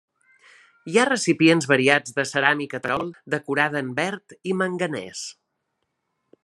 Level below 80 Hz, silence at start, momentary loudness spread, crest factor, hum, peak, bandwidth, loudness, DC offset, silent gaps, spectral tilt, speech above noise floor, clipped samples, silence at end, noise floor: -68 dBFS; 0.85 s; 14 LU; 22 dB; none; 0 dBFS; 12 kHz; -22 LUFS; under 0.1%; none; -4 dB/octave; 54 dB; under 0.1%; 1.1 s; -77 dBFS